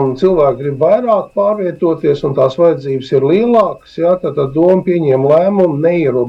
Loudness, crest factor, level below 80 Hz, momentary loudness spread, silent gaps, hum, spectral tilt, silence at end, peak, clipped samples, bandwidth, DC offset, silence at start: -12 LUFS; 10 dB; -46 dBFS; 5 LU; none; none; -9 dB/octave; 0 s; -2 dBFS; under 0.1%; 7.6 kHz; under 0.1%; 0 s